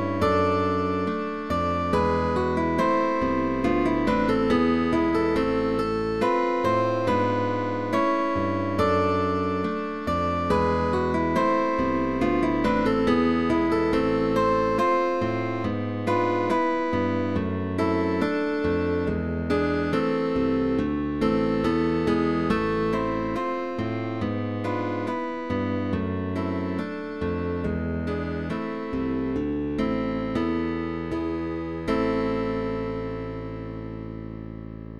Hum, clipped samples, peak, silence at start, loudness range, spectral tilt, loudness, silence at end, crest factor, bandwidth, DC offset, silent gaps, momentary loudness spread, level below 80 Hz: none; under 0.1%; -10 dBFS; 0 s; 5 LU; -7.5 dB/octave; -25 LUFS; 0 s; 14 dB; 12.5 kHz; 0.5%; none; 7 LU; -42 dBFS